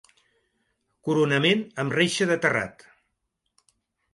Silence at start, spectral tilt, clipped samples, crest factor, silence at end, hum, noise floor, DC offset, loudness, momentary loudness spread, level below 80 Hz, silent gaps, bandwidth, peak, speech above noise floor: 1.05 s; -4.5 dB/octave; under 0.1%; 20 dB; 1.45 s; none; -79 dBFS; under 0.1%; -23 LUFS; 8 LU; -66 dBFS; none; 11.5 kHz; -8 dBFS; 55 dB